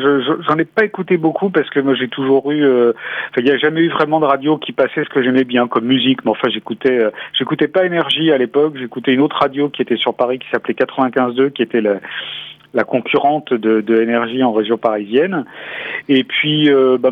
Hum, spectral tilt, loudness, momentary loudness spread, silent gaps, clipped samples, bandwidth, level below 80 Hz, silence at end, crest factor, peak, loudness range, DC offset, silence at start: none; -7.5 dB/octave; -15 LUFS; 6 LU; none; under 0.1%; 5.2 kHz; -64 dBFS; 0 s; 14 dB; 0 dBFS; 2 LU; under 0.1%; 0 s